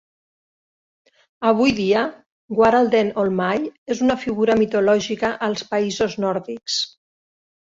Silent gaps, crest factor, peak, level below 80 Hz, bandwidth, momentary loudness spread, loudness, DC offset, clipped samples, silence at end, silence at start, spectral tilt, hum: 2.26-2.48 s, 3.78-3.86 s; 18 dB; -2 dBFS; -54 dBFS; 7.8 kHz; 8 LU; -20 LUFS; under 0.1%; under 0.1%; 0.85 s; 1.4 s; -5 dB/octave; none